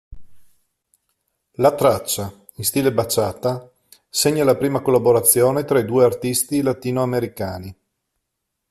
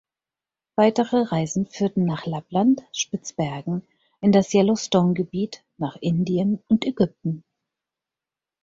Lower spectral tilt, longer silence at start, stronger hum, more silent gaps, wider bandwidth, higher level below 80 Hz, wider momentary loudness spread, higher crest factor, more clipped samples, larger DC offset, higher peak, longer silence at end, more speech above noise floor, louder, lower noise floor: second, -4.5 dB/octave vs -6 dB/octave; second, 0.1 s vs 0.8 s; neither; neither; first, 16 kHz vs 7.8 kHz; first, -52 dBFS vs -60 dBFS; first, 14 LU vs 11 LU; about the same, 20 dB vs 18 dB; neither; neither; first, 0 dBFS vs -6 dBFS; second, 0.95 s vs 1.25 s; second, 60 dB vs 68 dB; first, -19 LUFS vs -23 LUFS; second, -78 dBFS vs -90 dBFS